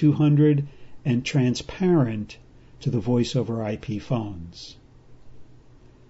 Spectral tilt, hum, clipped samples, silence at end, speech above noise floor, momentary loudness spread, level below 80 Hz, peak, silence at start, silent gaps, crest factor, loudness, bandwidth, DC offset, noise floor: -7.5 dB/octave; none; under 0.1%; 0.5 s; 28 dB; 19 LU; -52 dBFS; -8 dBFS; 0 s; none; 16 dB; -24 LUFS; 8 kHz; under 0.1%; -50 dBFS